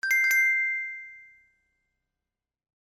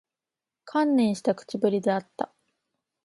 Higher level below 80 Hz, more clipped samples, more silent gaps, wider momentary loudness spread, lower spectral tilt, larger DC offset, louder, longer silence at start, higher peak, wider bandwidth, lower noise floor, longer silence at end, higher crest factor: second, -84 dBFS vs -76 dBFS; neither; neither; first, 20 LU vs 12 LU; second, 4 dB/octave vs -6.5 dB/octave; neither; first, -22 LUFS vs -26 LUFS; second, 0.05 s vs 0.65 s; second, -14 dBFS vs -10 dBFS; first, over 20 kHz vs 11.5 kHz; about the same, -89 dBFS vs -89 dBFS; first, 1.6 s vs 0.8 s; about the same, 16 dB vs 18 dB